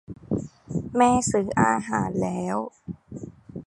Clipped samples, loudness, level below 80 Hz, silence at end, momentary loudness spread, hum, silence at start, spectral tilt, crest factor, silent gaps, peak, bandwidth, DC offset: under 0.1%; -24 LUFS; -50 dBFS; 0.05 s; 20 LU; none; 0.1 s; -5.5 dB/octave; 20 dB; none; -4 dBFS; 11.5 kHz; under 0.1%